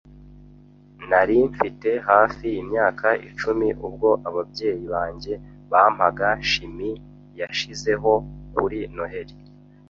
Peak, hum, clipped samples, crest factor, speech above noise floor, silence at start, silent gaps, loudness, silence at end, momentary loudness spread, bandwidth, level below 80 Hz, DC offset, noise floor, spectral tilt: -2 dBFS; 50 Hz at -50 dBFS; under 0.1%; 22 dB; 27 dB; 0.15 s; none; -22 LUFS; 0.5 s; 14 LU; 7.6 kHz; -46 dBFS; under 0.1%; -49 dBFS; -5 dB/octave